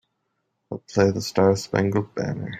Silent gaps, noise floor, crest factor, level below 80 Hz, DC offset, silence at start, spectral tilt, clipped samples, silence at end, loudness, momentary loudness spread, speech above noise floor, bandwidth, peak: none; -75 dBFS; 18 dB; -58 dBFS; under 0.1%; 0.7 s; -6 dB/octave; under 0.1%; 0 s; -22 LUFS; 11 LU; 53 dB; 16 kHz; -4 dBFS